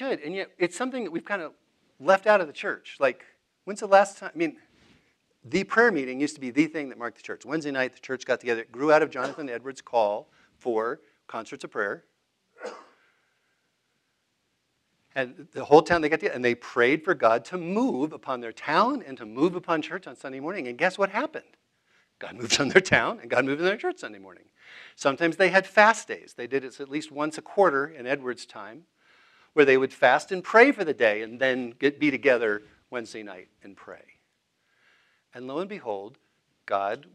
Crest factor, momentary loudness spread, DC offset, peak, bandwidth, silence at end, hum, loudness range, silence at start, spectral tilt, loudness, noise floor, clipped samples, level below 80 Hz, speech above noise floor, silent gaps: 26 dB; 18 LU; under 0.1%; -2 dBFS; 12 kHz; 0.15 s; none; 12 LU; 0 s; -4.5 dB/octave; -25 LUFS; -75 dBFS; under 0.1%; -68 dBFS; 49 dB; none